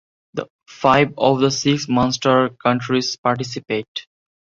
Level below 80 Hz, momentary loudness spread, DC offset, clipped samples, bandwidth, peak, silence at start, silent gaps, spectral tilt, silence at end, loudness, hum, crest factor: -54 dBFS; 15 LU; under 0.1%; under 0.1%; 7.6 kHz; -2 dBFS; 0.35 s; 0.50-0.59 s, 3.18-3.23 s, 3.88-3.95 s; -5 dB/octave; 0.5 s; -18 LUFS; none; 18 dB